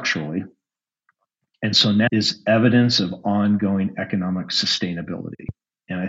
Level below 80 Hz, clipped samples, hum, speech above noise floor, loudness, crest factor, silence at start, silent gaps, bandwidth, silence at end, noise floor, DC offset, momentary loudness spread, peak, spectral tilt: -58 dBFS; under 0.1%; none; 67 dB; -20 LUFS; 18 dB; 0 s; none; 8 kHz; 0 s; -87 dBFS; under 0.1%; 15 LU; -4 dBFS; -5 dB/octave